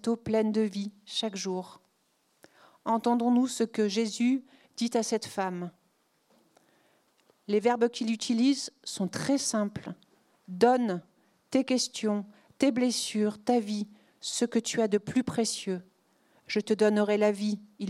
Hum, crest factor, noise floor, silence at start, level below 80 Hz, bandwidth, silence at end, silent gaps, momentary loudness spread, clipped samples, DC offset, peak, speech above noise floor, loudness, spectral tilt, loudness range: none; 20 dB; -72 dBFS; 0.05 s; -74 dBFS; 13.5 kHz; 0 s; none; 13 LU; under 0.1%; under 0.1%; -10 dBFS; 44 dB; -29 LUFS; -4.5 dB/octave; 3 LU